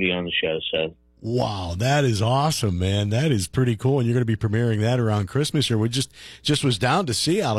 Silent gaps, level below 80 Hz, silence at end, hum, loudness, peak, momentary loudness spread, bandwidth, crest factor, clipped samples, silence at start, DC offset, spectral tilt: none; -48 dBFS; 0 s; none; -22 LUFS; -8 dBFS; 6 LU; 14 kHz; 14 dB; under 0.1%; 0 s; under 0.1%; -5.5 dB/octave